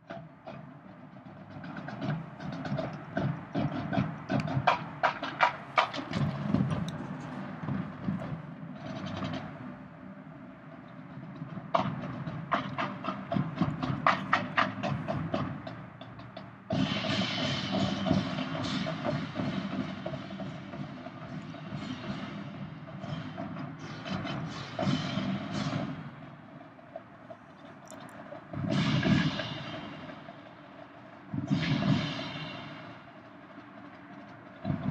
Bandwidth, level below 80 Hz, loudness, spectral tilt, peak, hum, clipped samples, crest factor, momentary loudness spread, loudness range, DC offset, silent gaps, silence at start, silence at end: 9.6 kHz; -60 dBFS; -33 LUFS; -6.5 dB/octave; -8 dBFS; none; under 0.1%; 26 dB; 19 LU; 9 LU; under 0.1%; none; 0 s; 0 s